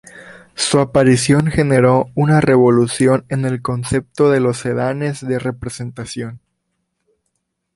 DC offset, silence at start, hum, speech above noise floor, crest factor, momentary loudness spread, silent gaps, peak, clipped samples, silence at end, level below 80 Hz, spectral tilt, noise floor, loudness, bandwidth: under 0.1%; 0.15 s; none; 57 dB; 14 dB; 14 LU; none; -2 dBFS; under 0.1%; 1.4 s; -44 dBFS; -6 dB/octave; -72 dBFS; -15 LUFS; 11.5 kHz